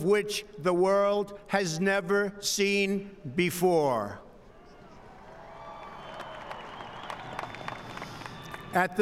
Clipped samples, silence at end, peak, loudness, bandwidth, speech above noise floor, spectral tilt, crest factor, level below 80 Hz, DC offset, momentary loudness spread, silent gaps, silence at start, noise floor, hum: under 0.1%; 0 s; -12 dBFS; -28 LUFS; 16 kHz; 25 dB; -4.5 dB/octave; 18 dB; -60 dBFS; under 0.1%; 19 LU; none; 0 s; -52 dBFS; none